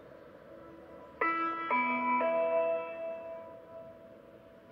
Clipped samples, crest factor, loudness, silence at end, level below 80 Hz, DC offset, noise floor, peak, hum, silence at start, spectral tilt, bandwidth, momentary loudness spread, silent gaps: under 0.1%; 18 dB; -32 LUFS; 0 s; -74 dBFS; under 0.1%; -55 dBFS; -18 dBFS; none; 0 s; -6.5 dB/octave; 5.6 kHz; 23 LU; none